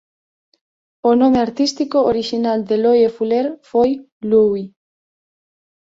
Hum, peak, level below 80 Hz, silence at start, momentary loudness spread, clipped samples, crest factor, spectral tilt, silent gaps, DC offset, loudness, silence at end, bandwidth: none; -2 dBFS; -54 dBFS; 1.05 s; 7 LU; under 0.1%; 16 dB; -5.5 dB/octave; 4.12-4.21 s; under 0.1%; -17 LUFS; 1.15 s; 7.8 kHz